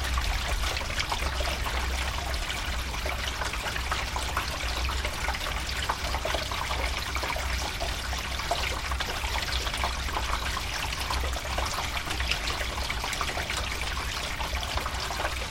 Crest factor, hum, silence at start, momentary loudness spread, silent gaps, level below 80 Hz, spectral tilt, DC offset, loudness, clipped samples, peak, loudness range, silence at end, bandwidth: 22 dB; none; 0 s; 2 LU; none; -34 dBFS; -2.5 dB/octave; under 0.1%; -30 LUFS; under 0.1%; -8 dBFS; 1 LU; 0 s; 16.5 kHz